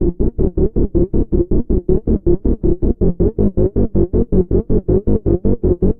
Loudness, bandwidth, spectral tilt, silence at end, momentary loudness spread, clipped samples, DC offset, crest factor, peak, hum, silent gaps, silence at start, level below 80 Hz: -17 LUFS; 1.9 kHz; -15.5 dB/octave; 0.05 s; 2 LU; under 0.1%; under 0.1%; 12 dB; -2 dBFS; none; none; 0 s; -20 dBFS